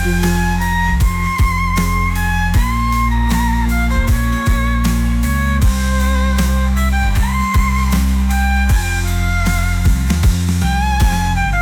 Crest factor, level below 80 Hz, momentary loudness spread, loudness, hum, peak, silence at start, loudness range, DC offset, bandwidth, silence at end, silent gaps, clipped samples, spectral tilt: 10 dB; -16 dBFS; 2 LU; -16 LUFS; none; -4 dBFS; 0 s; 0 LU; under 0.1%; 18.5 kHz; 0 s; none; under 0.1%; -5.5 dB/octave